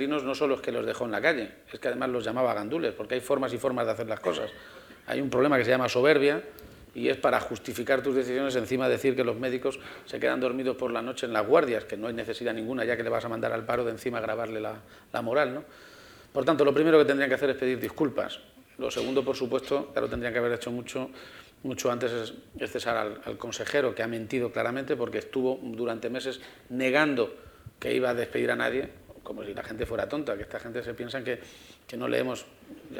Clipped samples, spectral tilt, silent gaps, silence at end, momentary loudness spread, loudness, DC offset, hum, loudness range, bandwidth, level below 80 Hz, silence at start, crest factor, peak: under 0.1%; -5 dB/octave; none; 0 s; 14 LU; -29 LUFS; under 0.1%; none; 6 LU; over 20 kHz; -60 dBFS; 0 s; 22 dB; -6 dBFS